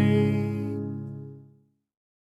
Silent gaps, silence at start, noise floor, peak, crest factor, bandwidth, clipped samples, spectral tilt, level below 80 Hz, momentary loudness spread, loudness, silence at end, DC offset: none; 0 s; -61 dBFS; -10 dBFS; 18 dB; 12 kHz; under 0.1%; -9 dB/octave; -64 dBFS; 18 LU; -28 LUFS; 0.95 s; under 0.1%